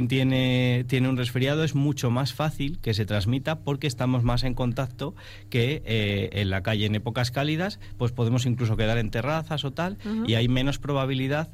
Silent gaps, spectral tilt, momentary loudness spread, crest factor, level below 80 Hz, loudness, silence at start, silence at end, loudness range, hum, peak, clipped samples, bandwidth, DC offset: none; -6.5 dB/octave; 7 LU; 14 dB; -40 dBFS; -26 LUFS; 0 s; 0 s; 2 LU; none; -10 dBFS; under 0.1%; 15 kHz; under 0.1%